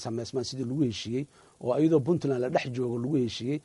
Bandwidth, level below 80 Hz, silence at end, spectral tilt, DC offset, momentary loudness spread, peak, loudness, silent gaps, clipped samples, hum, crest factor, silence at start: 11.5 kHz; -64 dBFS; 0.05 s; -6.5 dB/octave; under 0.1%; 10 LU; -12 dBFS; -29 LUFS; none; under 0.1%; none; 16 dB; 0 s